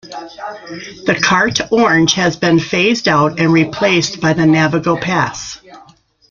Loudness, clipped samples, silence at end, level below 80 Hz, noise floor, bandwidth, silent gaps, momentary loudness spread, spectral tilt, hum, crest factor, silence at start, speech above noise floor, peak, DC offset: -13 LUFS; under 0.1%; 0.5 s; -48 dBFS; -47 dBFS; 7.4 kHz; none; 17 LU; -4.5 dB/octave; none; 14 dB; 0.05 s; 33 dB; 0 dBFS; under 0.1%